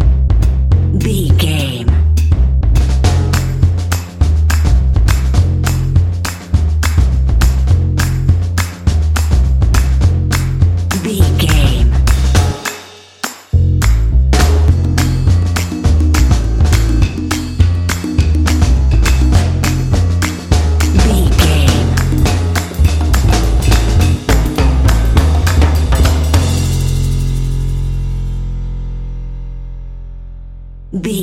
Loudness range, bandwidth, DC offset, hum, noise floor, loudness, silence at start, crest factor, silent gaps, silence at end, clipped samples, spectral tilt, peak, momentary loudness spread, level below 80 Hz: 2 LU; 16 kHz; under 0.1%; none; -33 dBFS; -13 LUFS; 0 s; 12 dB; none; 0 s; under 0.1%; -5.5 dB/octave; 0 dBFS; 9 LU; -14 dBFS